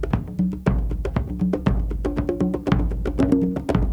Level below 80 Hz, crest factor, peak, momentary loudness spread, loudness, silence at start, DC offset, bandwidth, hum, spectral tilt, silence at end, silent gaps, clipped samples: -28 dBFS; 18 dB; -4 dBFS; 6 LU; -23 LUFS; 0 s; under 0.1%; 8.8 kHz; none; -9 dB/octave; 0 s; none; under 0.1%